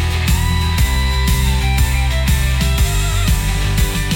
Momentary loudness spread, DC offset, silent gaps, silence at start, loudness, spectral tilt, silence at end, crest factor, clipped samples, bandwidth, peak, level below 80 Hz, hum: 1 LU; 0.2%; none; 0 s; -16 LUFS; -4 dB/octave; 0 s; 12 dB; under 0.1%; 18 kHz; -2 dBFS; -16 dBFS; none